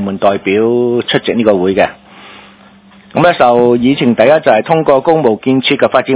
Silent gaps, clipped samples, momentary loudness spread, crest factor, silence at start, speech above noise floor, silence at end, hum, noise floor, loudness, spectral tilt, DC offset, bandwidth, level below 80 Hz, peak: none; 1%; 5 LU; 10 dB; 0 s; 31 dB; 0 s; none; -41 dBFS; -10 LUFS; -10 dB/octave; under 0.1%; 4 kHz; -48 dBFS; 0 dBFS